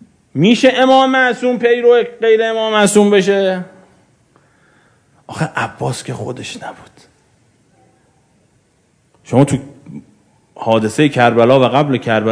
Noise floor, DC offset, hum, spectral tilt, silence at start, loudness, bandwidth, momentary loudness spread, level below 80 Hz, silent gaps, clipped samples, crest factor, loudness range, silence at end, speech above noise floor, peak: -57 dBFS; under 0.1%; none; -5.5 dB/octave; 0.35 s; -13 LUFS; 11 kHz; 17 LU; -54 dBFS; none; 0.2%; 14 dB; 13 LU; 0 s; 44 dB; 0 dBFS